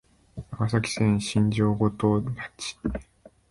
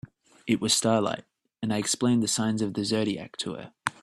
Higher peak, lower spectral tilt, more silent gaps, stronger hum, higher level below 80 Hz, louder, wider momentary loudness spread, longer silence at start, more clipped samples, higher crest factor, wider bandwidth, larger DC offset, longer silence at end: about the same, -8 dBFS vs -6 dBFS; first, -6 dB/octave vs -4 dB/octave; neither; neither; first, -46 dBFS vs -64 dBFS; about the same, -26 LUFS vs -27 LUFS; first, 16 LU vs 12 LU; about the same, 0.35 s vs 0.45 s; neither; about the same, 18 dB vs 22 dB; second, 11.5 kHz vs 14.5 kHz; neither; first, 0.5 s vs 0.1 s